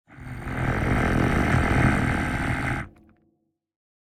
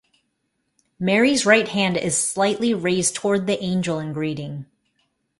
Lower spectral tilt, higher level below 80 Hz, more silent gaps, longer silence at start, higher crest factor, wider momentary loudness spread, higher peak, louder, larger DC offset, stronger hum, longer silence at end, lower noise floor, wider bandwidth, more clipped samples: first, -6.5 dB/octave vs -4 dB/octave; first, -34 dBFS vs -60 dBFS; neither; second, 0.1 s vs 1 s; about the same, 16 dB vs 20 dB; first, 13 LU vs 10 LU; second, -10 dBFS vs -2 dBFS; second, -24 LUFS vs -20 LUFS; neither; neither; first, 1.3 s vs 0.75 s; about the same, -71 dBFS vs -73 dBFS; first, 14.5 kHz vs 11.5 kHz; neither